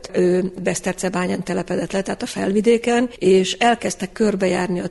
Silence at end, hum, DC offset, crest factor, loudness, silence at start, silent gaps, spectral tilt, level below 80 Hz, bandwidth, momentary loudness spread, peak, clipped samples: 0 s; none; under 0.1%; 14 dB; -20 LUFS; 0 s; none; -5 dB/octave; -50 dBFS; 11.5 kHz; 7 LU; -4 dBFS; under 0.1%